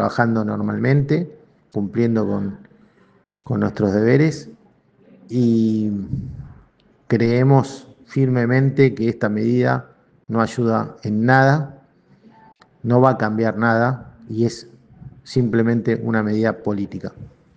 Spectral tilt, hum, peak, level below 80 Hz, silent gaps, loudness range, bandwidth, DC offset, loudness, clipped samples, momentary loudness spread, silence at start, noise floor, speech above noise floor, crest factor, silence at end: -8 dB/octave; none; 0 dBFS; -54 dBFS; none; 4 LU; 8.2 kHz; under 0.1%; -19 LUFS; under 0.1%; 14 LU; 0 s; -57 dBFS; 39 dB; 20 dB; 0.3 s